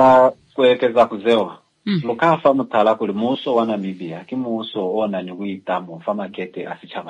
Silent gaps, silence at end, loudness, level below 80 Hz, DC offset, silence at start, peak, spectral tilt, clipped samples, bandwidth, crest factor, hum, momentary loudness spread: none; 0 s; -19 LUFS; -64 dBFS; under 0.1%; 0 s; -2 dBFS; -7 dB/octave; under 0.1%; 9.2 kHz; 16 dB; none; 13 LU